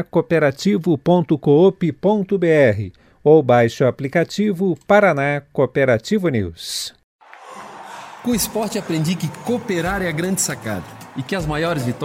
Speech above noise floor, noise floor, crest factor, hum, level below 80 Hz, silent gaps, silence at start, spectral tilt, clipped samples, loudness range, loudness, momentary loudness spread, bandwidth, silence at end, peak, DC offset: 21 dB; -38 dBFS; 18 dB; none; -46 dBFS; 7.04-7.19 s; 0 s; -5.5 dB/octave; under 0.1%; 7 LU; -18 LUFS; 15 LU; 16 kHz; 0 s; 0 dBFS; under 0.1%